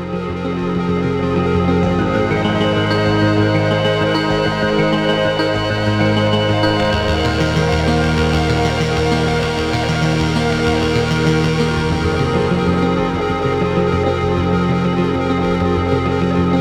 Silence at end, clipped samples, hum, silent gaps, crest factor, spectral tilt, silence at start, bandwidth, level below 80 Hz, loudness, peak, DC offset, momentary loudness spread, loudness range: 0 s; under 0.1%; none; none; 14 dB; -6.5 dB/octave; 0 s; 12.5 kHz; -30 dBFS; -16 LUFS; -2 dBFS; under 0.1%; 3 LU; 1 LU